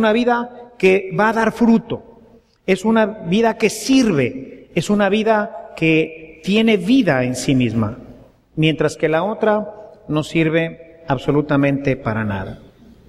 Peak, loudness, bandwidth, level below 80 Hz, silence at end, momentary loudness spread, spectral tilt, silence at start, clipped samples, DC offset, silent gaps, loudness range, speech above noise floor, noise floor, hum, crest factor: -2 dBFS; -17 LUFS; 14.5 kHz; -46 dBFS; 0.55 s; 13 LU; -6 dB/octave; 0 s; under 0.1%; under 0.1%; none; 3 LU; 32 dB; -49 dBFS; none; 16 dB